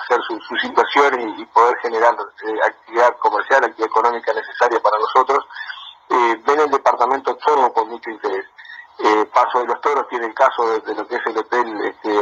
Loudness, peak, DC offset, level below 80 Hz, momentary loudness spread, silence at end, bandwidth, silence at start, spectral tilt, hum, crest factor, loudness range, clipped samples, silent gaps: -18 LUFS; 0 dBFS; under 0.1%; -70 dBFS; 9 LU; 0 s; 7.8 kHz; 0 s; -2.5 dB/octave; none; 18 dB; 2 LU; under 0.1%; none